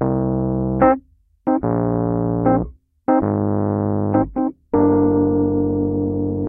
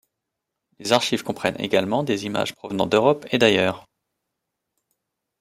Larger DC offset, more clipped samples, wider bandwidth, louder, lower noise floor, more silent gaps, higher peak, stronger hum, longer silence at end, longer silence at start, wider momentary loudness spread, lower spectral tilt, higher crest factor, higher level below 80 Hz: neither; neither; second, 2.8 kHz vs 15.5 kHz; about the same, -19 LUFS vs -21 LUFS; second, -44 dBFS vs -82 dBFS; neither; about the same, -2 dBFS vs -2 dBFS; neither; second, 0 s vs 1.6 s; second, 0 s vs 0.8 s; about the same, 6 LU vs 8 LU; first, -14 dB/octave vs -4.5 dB/octave; second, 16 dB vs 22 dB; first, -38 dBFS vs -64 dBFS